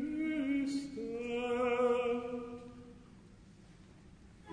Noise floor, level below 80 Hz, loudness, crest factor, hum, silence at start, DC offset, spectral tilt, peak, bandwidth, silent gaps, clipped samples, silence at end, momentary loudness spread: -58 dBFS; -64 dBFS; -35 LUFS; 16 dB; none; 0 s; under 0.1%; -5.5 dB/octave; -20 dBFS; 10 kHz; none; under 0.1%; 0 s; 21 LU